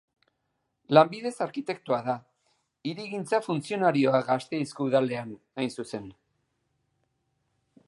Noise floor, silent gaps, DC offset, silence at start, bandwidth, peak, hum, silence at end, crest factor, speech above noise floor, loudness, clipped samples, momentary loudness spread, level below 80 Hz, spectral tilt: -78 dBFS; none; under 0.1%; 0.9 s; 11.5 kHz; -4 dBFS; none; 1.75 s; 24 dB; 51 dB; -27 LUFS; under 0.1%; 15 LU; -74 dBFS; -6 dB/octave